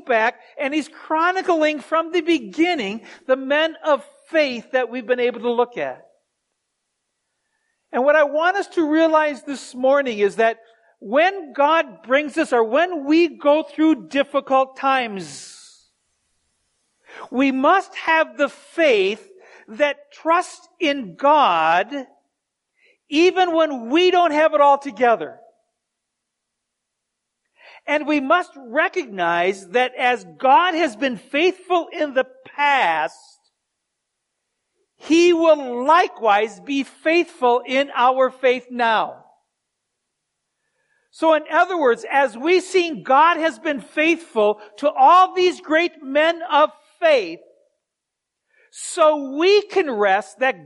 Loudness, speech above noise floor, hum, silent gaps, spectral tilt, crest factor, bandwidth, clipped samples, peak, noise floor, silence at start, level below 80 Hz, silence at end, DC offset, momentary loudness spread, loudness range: -19 LUFS; 63 dB; none; none; -3.5 dB/octave; 16 dB; 11.5 kHz; under 0.1%; -4 dBFS; -82 dBFS; 0.05 s; -74 dBFS; 0.1 s; under 0.1%; 8 LU; 6 LU